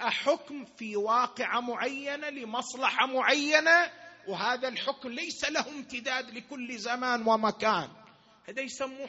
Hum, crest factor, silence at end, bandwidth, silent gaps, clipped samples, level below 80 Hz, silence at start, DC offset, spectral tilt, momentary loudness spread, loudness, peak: none; 22 dB; 0 s; 8 kHz; none; under 0.1%; -74 dBFS; 0 s; under 0.1%; 0 dB/octave; 15 LU; -29 LUFS; -8 dBFS